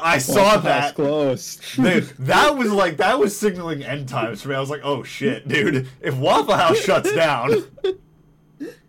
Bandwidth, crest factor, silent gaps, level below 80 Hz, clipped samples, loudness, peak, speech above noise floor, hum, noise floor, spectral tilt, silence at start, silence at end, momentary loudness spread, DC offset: 17 kHz; 14 dB; none; -52 dBFS; under 0.1%; -19 LUFS; -6 dBFS; 34 dB; none; -53 dBFS; -4.5 dB/octave; 0 s; 0.15 s; 11 LU; under 0.1%